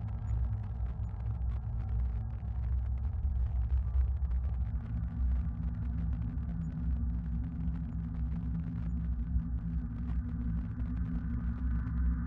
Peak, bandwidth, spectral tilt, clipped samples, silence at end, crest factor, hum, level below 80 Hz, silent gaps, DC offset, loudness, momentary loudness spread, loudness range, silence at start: -20 dBFS; 2.6 kHz; -11 dB/octave; under 0.1%; 0 s; 12 dB; none; -34 dBFS; none; under 0.1%; -36 LUFS; 4 LU; 2 LU; 0 s